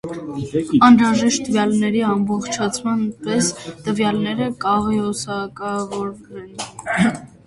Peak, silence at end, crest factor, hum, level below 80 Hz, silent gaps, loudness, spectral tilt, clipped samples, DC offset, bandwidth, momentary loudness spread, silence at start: 0 dBFS; 0.2 s; 18 dB; none; -50 dBFS; none; -19 LUFS; -4.5 dB/octave; under 0.1%; under 0.1%; 11.5 kHz; 15 LU; 0.05 s